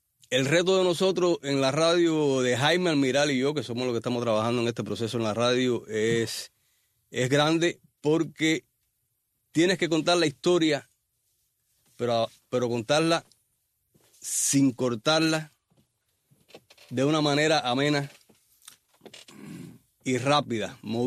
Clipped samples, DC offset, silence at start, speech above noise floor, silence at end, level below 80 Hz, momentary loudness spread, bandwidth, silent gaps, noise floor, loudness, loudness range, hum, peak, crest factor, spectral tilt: under 0.1%; under 0.1%; 0.3 s; 51 dB; 0 s; -68 dBFS; 9 LU; 14.5 kHz; none; -76 dBFS; -25 LUFS; 4 LU; none; -8 dBFS; 18 dB; -4.5 dB/octave